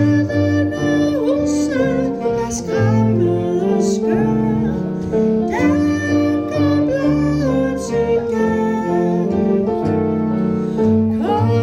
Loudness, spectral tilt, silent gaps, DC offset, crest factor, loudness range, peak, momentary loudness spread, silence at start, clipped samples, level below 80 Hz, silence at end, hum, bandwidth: -17 LUFS; -7.5 dB/octave; none; under 0.1%; 12 dB; 1 LU; -4 dBFS; 3 LU; 0 s; under 0.1%; -40 dBFS; 0 s; none; 11.5 kHz